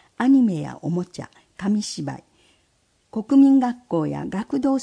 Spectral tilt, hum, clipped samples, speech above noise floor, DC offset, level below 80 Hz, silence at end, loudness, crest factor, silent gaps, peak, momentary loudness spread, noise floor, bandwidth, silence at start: -6.5 dB/octave; none; under 0.1%; 45 dB; under 0.1%; -60 dBFS; 0 s; -21 LUFS; 14 dB; none; -6 dBFS; 17 LU; -65 dBFS; 10 kHz; 0.2 s